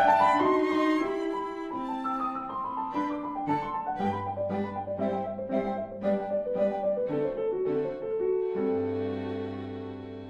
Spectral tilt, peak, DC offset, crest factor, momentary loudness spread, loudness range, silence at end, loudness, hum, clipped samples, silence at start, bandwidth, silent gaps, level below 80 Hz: -7.5 dB/octave; -10 dBFS; under 0.1%; 18 dB; 9 LU; 2 LU; 0 s; -30 LUFS; none; under 0.1%; 0 s; 10.5 kHz; none; -60 dBFS